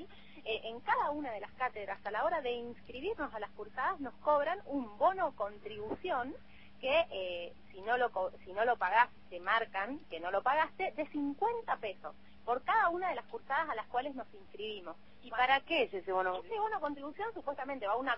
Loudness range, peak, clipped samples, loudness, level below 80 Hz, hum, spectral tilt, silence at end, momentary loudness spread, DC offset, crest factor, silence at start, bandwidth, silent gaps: 3 LU; -14 dBFS; under 0.1%; -35 LUFS; -66 dBFS; none; -1 dB/octave; 0 s; 14 LU; 0.2%; 22 dB; 0 s; 5.8 kHz; none